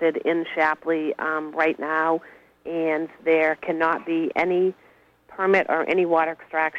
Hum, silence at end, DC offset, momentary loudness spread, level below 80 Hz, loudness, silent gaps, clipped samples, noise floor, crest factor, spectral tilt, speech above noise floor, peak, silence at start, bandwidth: none; 0 s; under 0.1%; 6 LU; -68 dBFS; -23 LUFS; none; under 0.1%; -53 dBFS; 16 dB; -7 dB/octave; 30 dB; -8 dBFS; 0 s; 7.6 kHz